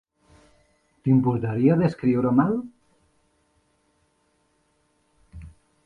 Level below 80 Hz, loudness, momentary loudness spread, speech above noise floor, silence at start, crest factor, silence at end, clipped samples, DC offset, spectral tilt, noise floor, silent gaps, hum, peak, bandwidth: -54 dBFS; -22 LUFS; 25 LU; 47 dB; 1.05 s; 20 dB; 0.35 s; under 0.1%; under 0.1%; -10.5 dB/octave; -68 dBFS; none; none; -6 dBFS; 4.9 kHz